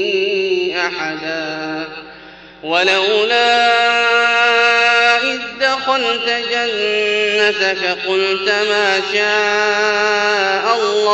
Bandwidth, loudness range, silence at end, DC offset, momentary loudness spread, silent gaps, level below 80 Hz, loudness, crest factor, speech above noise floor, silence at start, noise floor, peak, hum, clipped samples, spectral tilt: 8.6 kHz; 4 LU; 0 s; under 0.1%; 10 LU; none; -56 dBFS; -14 LUFS; 14 dB; 23 dB; 0 s; -38 dBFS; -2 dBFS; none; under 0.1%; -2 dB/octave